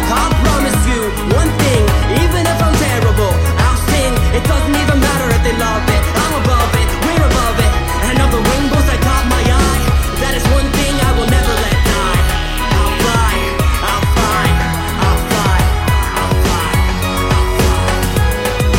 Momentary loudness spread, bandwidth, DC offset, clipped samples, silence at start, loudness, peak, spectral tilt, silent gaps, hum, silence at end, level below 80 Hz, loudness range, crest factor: 2 LU; 16.5 kHz; under 0.1%; under 0.1%; 0 s; -13 LUFS; 0 dBFS; -5 dB/octave; none; none; 0 s; -16 dBFS; 1 LU; 12 dB